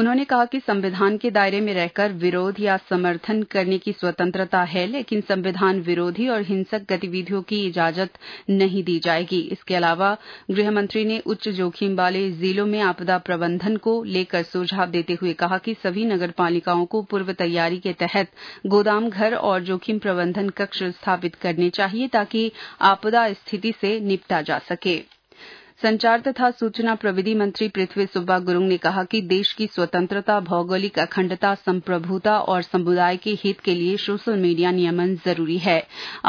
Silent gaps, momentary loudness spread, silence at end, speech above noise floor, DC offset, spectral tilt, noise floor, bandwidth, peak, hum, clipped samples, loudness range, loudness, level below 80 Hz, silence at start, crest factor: none; 5 LU; 0 s; 24 dB; under 0.1%; -7 dB/octave; -46 dBFS; 5.4 kHz; -4 dBFS; none; under 0.1%; 2 LU; -22 LUFS; -68 dBFS; 0 s; 18 dB